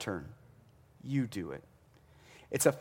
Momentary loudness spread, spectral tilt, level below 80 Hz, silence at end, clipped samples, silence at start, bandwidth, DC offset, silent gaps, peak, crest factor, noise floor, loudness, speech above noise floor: 24 LU; -5 dB/octave; -66 dBFS; 0 s; under 0.1%; 0 s; 16.5 kHz; under 0.1%; none; -10 dBFS; 26 dB; -62 dBFS; -35 LUFS; 29 dB